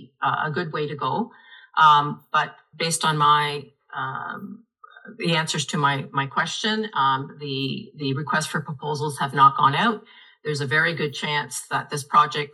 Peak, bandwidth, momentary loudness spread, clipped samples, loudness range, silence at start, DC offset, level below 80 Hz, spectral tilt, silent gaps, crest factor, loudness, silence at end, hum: -2 dBFS; 12.5 kHz; 13 LU; under 0.1%; 4 LU; 0 s; under 0.1%; -76 dBFS; -4 dB/octave; none; 20 dB; -22 LUFS; 0.05 s; none